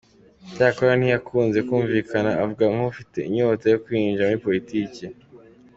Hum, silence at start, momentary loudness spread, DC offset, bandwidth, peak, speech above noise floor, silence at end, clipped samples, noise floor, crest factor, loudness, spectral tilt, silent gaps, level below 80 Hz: none; 0.45 s; 9 LU; under 0.1%; 7.8 kHz; -4 dBFS; 27 dB; 0.4 s; under 0.1%; -49 dBFS; 18 dB; -22 LUFS; -7.5 dB/octave; none; -58 dBFS